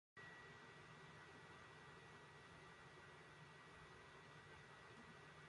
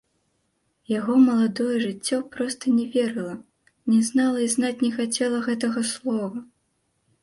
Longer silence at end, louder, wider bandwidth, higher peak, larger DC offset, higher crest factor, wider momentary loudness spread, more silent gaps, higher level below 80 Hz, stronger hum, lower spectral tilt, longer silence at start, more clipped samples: second, 0 s vs 0.8 s; second, -62 LUFS vs -23 LUFS; about the same, 11 kHz vs 11.5 kHz; second, -48 dBFS vs -8 dBFS; neither; about the same, 14 dB vs 16 dB; second, 2 LU vs 11 LU; neither; second, -80 dBFS vs -68 dBFS; neither; about the same, -4.5 dB/octave vs -4 dB/octave; second, 0.15 s vs 0.9 s; neither